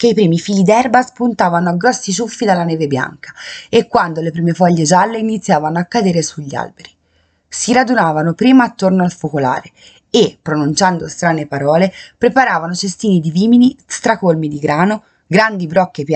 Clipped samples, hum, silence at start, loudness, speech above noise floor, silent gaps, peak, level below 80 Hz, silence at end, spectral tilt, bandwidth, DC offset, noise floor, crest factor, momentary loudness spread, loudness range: under 0.1%; none; 0 s; -14 LUFS; 45 dB; none; 0 dBFS; -54 dBFS; 0 s; -5.5 dB/octave; 9.2 kHz; under 0.1%; -58 dBFS; 14 dB; 8 LU; 2 LU